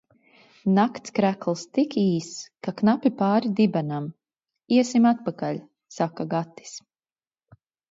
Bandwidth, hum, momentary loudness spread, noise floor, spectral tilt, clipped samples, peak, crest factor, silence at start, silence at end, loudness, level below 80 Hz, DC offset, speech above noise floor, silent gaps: 7.8 kHz; none; 16 LU; under -90 dBFS; -6.5 dB/octave; under 0.1%; -8 dBFS; 18 dB; 0.65 s; 1.15 s; -24 LUFS; -70 dBFS; under 0.1%; over 67 dB; none